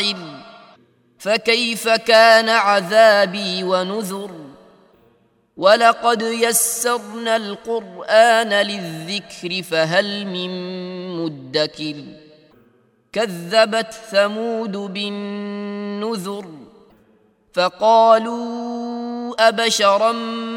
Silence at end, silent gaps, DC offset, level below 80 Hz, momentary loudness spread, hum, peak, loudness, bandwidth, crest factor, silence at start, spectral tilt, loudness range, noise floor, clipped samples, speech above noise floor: 0 s; none; under 0.1%; -70 dBFS; 15 LU; none; 0 dBFS; -18 LUFS; 17 kHz; 18 dB; 0 s; -3 dB/octave; 9 LU; -58 dBFS; under 0.1%; 40 dB